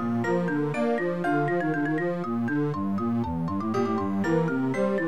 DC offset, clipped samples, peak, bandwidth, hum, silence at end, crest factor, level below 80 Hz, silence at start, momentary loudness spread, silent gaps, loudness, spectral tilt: 0.5%; under 0.1%; -14 dBFS; 11.5 kHz; none; 0 s; 12 dB; -56 dBFS; 0 s; 3 LU; none; -27 LUFS; -8 dB/octave